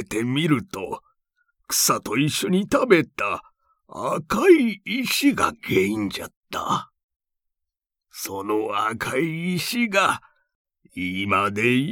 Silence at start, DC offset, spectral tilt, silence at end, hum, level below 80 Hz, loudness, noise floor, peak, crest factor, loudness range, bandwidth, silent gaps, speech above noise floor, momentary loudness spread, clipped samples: 0 s; under 0.1%; -4 dB/octave; 0 s; none; -58 dBFS; -22 LUFS; -84 dBFS; -2 dBFS; 22 dB; 7 LU; 20 kHz; 6.37-6.41 s, 7.03-7.08 s, 7.16-7.20 s, 10.55-10.65 s; 62 dB; 14 LU; under 0.1%